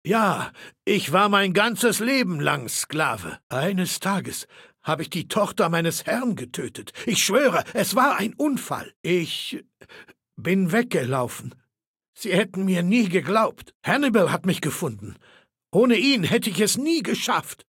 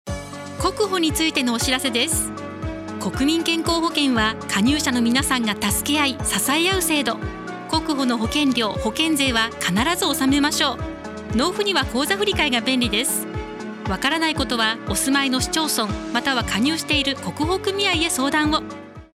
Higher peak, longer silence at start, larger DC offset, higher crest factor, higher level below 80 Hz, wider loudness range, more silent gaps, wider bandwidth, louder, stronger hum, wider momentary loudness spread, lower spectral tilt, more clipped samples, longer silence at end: about the same, -4 dBFS vs -6 dBFS; about the same, 0.05 s vs 0.05 s; neither; about the same, 20 dB vs 16 dB; second, -66 dBFS vs -40 dBFS; about the same, 4 LU vs 2 LU; first, 3.43-3.50 s, 8.96-9.04 s, 11.87-11.94 s, 12.08-12.13 s, 13.75-13.80 s vs none; about the same, 17 kHz vs 16.5 kHz; second, -23 LUFS vs -20 LUFS; neither; first, 13 LU vs 10 LU; about the same, -4 dB/octave vs -3 dB/octave; neither; about the same, 0.15 s vs 0.1 s